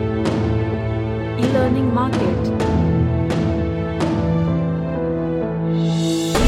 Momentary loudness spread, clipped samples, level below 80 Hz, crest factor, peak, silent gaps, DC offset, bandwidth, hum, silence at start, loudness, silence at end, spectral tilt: 4 LU; under 0.1%; -34 dBFS; 16 dB; -2 dBFS; none; under 0.1%; 13.5 kHz; none; 0 s; -20 LUFS; 0 s; -7 dB/octave